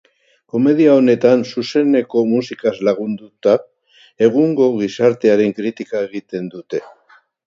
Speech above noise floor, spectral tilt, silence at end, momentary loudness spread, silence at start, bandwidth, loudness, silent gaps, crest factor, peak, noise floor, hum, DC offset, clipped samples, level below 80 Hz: 37 dB; -7 dB/octave; 0.6 s; 14 LU; 0.55 s; 7.6 kHz; -16 LUFS; none; 16 dB; 0 dBFS; -52 dBFS; none; under 0.1%; under 0.1%; -64 dBFS